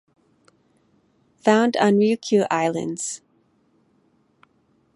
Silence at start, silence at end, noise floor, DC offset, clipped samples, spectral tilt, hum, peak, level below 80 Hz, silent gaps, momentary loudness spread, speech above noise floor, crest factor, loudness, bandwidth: 1.45 s; 1.8 s; -63 dBFS; under 0.1%; under 0.1%; -5 dB/octave; none; -4 dBFS; -74 dBFS; none; 11 LU; 44 dB; 20 dB; -20 LUFS; 11.5 kHz